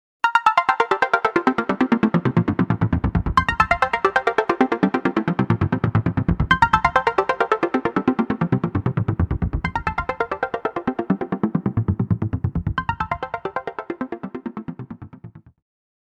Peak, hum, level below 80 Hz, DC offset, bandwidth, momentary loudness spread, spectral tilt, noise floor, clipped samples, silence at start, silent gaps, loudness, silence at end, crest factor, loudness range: -2 dBFS; none; -36 dBFS; under 0.1%; 10 kHz; 12 LU; -7.5 dB/octave; -42 dBFS; under 0.1%; 0.25 s; none; -21 LUFS; 0.6 s; 20 dB; 6 LU